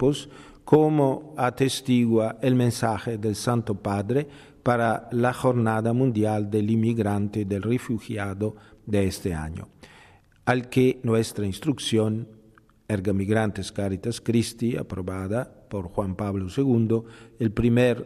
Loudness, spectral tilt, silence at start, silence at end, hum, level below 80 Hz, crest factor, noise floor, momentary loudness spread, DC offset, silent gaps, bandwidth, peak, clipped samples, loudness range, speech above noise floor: -25 LUFS; -6.5 dB/octave; 0 s; 0 s; none; -50 dBFS; 18 dB; -56 dBFS; 9 LU; under 0.1%; none; 13.5 kHz; -6 dBFS; under 0.1%; 4 LU; 32 dB